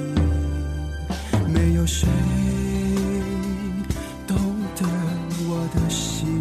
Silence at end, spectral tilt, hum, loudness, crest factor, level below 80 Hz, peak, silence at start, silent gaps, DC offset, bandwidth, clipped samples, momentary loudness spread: 0 s; -6 dB/octave; none; -24 LUFS; 16 dB; -32 dBFS; -6 dBFS; 0 s; none; under 0.1%; 14 kHz; under 0.1%; 8 LU